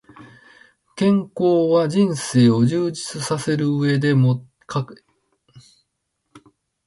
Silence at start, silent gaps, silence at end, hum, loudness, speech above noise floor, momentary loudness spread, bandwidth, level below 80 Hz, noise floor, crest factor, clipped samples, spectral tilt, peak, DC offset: 0.2 s; none; 0.5 s; none; -19 LUFS; 57 dB; 11 LU; 11.5 kHz; -60 dBFS; -75 dBFS; 16 dB; under 0.1%; -6.5 dB/octave; -4 dBFS; under 0.1%